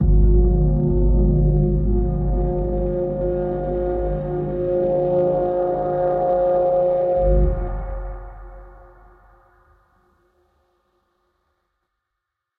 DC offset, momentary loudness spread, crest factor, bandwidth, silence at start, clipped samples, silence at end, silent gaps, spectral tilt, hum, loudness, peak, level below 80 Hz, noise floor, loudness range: under 0.1%; 9 LU; 14 dB; 2.3 kHz; 0 s; under 0.1%; 3.85 s; none; -13 dB/octave; none; -20 LUFS; -6 dBFS; -24 dBFS; -81 dBFS; 7 LU